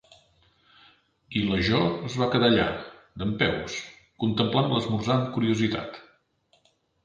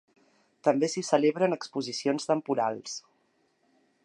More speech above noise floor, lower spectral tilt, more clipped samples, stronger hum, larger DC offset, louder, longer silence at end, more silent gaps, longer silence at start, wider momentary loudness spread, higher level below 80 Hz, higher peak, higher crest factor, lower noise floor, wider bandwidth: about the same, 42 dB vs 43 dB; first, -6 dB/octave vs -4.5 dB/octave; neither; neither; neither; first, -25 LUFS vs -28 LUFS; about the same, 1.05 s vs 1.05 s; neither; first, 1.3 s vs 0.65 s; first, 14 LU vs 10 LU; first, -50 dBFS vs -84 dBFS; about the same, -8 dBFS vs -8 dBFS; about the same, 20 dB vs 20 dB; second, -67 dBFS vs -71 dBFS; second, 7.8 kHz vs 11 kHz